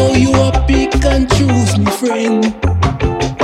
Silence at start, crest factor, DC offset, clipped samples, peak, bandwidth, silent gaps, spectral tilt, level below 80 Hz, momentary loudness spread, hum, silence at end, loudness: 0 s; 10 dB; under 0.1%; under 0.1%; -2 dBFS; 13.5 kHz; none; -6 dB/octave; -20 dBFS; 4 LU; none; 0 s; -13 LUFS